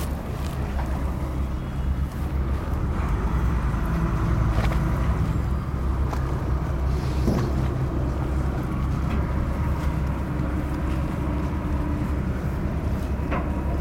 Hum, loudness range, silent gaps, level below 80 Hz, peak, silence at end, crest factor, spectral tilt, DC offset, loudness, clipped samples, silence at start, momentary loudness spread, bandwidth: none; 2 LU; none; -26 dBFS; -8 dBFS; 0 s; 16 dB; -8 dB/octave; under 0.1%; -26 LUFS; under 0.1%; 0 s; 4 LU; 15.5 kHz